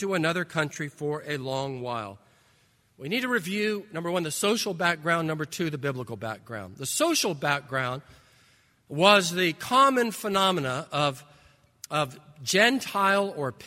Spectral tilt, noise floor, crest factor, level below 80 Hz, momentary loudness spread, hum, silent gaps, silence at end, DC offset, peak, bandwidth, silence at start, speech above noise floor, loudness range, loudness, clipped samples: -3.5 dB/octave; -64 dBFS; 24 dB; -68 dBFS; 14 LU; none; none; 0 s; under 0.1%; -4 dBFS; 16 kHz; 0 s; 38 dB; 7 LU; -26 LUFS; under 0.1%